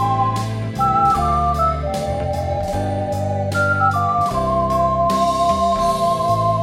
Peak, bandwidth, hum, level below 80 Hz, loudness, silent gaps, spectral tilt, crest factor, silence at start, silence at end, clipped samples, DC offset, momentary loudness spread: -4 dBFS; 16 kHz; none; -34 dBFS; -18 LUFS; none; -6.5 dB/octave; 12 dB; 0 s; 0 s; under 0.1%; under 0.1%; 6 LU